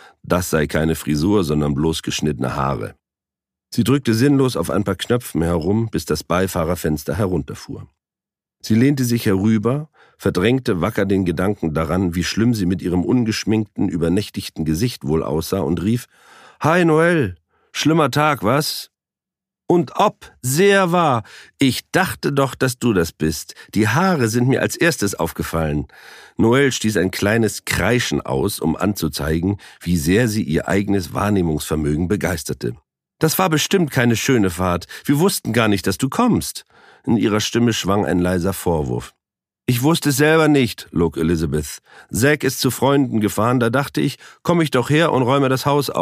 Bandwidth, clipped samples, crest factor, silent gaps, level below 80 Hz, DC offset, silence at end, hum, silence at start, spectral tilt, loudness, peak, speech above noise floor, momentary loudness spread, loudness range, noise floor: 15.5 kHz; under 0.1%; 18 dB; none; -40 dBFS; under 0.1%; 0 s; none; 0.25 s; -5.5 dB/octave; -19 LUFS; 0 dBFS; 72 dB; 8 LU; 3 LU; -90 dBFS